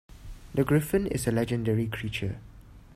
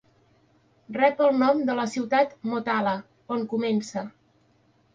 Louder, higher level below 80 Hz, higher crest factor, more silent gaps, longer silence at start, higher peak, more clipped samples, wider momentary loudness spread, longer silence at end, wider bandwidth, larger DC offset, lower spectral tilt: second, -28 LUFS vs -25 LUFS; first, -46 dBFS vs -70 dBFS; about the same, 18 dB vs 18 dB; neither; second, 0.1 s vs 0.9 s; second, -12 dBFS vs -8 dBFS; neither; about the same, 11 LU vs 13 LU; second, 0 s vs 0.85 s; first, 16 kHz vs 9.4 kHz; neither; about the same, -6.5 dB/octave vs -5.5 dB/octave